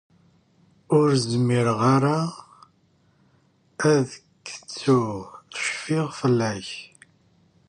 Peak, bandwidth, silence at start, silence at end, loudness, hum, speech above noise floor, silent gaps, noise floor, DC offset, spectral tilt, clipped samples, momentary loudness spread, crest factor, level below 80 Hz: -8 dBFS; 11 kHz; 0.9 s; 0.85 s; -23 LUFS; none; 40 dB; none; -62 dBFS; under 0.1%; -6 dB/octave; under 0.1%; 18 LU; 18 dB; -62 dBFS